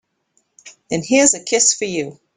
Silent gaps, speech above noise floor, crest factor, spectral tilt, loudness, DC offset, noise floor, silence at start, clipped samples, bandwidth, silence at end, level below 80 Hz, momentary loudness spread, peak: none; 49 dB; 18 dB; -2 dB/octave; -16 LUFS; under 0.1%; -66 dBFS; 0.65 s; under 0.1%; 10.5 kHz; 0.25 s; -58 dBFS; 12 LU; 0 dBFS